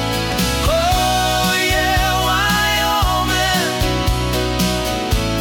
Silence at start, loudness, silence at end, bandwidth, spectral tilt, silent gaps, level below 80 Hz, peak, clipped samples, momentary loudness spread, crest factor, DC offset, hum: 0 s; -16 LUFS; 0 s; 18 kHz; -3.5 dB/octave; none; -26 dBFS; -6 dBFS; under 0.1%; 4 LU; 12 dB; under 0.1%; none